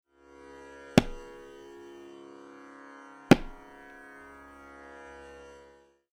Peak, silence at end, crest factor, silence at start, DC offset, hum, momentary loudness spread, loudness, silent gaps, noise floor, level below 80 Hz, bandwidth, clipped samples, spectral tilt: -6 dBFS; 2.65 s; 28 dB; 0.95 s; under 0.1%; none; 26 LU; -26 LUFS; none; -58 dBFS; -50 dBFS; 17.5 kHz; under 0.1%; -6 dB/octave